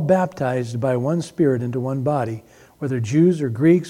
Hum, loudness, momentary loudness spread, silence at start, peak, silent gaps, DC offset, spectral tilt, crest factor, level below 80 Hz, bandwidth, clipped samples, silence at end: none; -21 LUFS; 9 LU; 0 s; -4 dBFS; none; under 0.1%; -8 dB/octave; 16 dB; -60 dBFS; 12.5 kHz; under 0.1%; 0 s